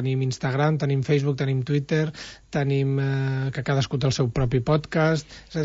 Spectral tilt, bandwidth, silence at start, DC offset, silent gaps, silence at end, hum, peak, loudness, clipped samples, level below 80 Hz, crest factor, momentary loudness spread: -6.5 dB/octave; 8 kHz; 0 s; under 0.1%; none; 0 s; none; -8 dBFS; -24 LUFS; under 0.1%; -46 dBFS; 14 dB; 5 LU